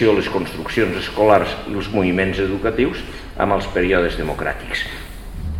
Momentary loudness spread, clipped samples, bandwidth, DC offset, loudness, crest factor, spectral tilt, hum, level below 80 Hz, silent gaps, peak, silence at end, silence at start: 12 LU; under 0.1%; 16.5 kHz; 0.4%; -19 LUFS; 18 dB; -6 dB/octave; none; -34 dBFS; none; 0 dBFS; 0 s; 0 s